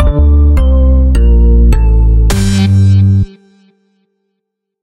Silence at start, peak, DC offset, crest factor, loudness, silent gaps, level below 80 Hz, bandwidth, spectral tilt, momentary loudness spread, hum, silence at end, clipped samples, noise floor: 0 s; 0 dBFS; under 0.1%; 8 dB; -9 LUFS; none; -10 dBFS; 12 kHz; -7.5 dB/octave; 3 LU; none; 1.55 s; under 0.1%; -72 dBFS